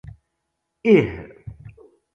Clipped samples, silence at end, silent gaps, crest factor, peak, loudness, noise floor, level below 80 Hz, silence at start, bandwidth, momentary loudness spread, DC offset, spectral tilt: under 0.1%; 0.45 s; none; 22 dB; -2 dBFS; -19 LUFS; -77 dBFS; -48 dBFS; 0.85 s; 6.8 kHz; 24 LU; under 0.1%; -8.5 dB/octave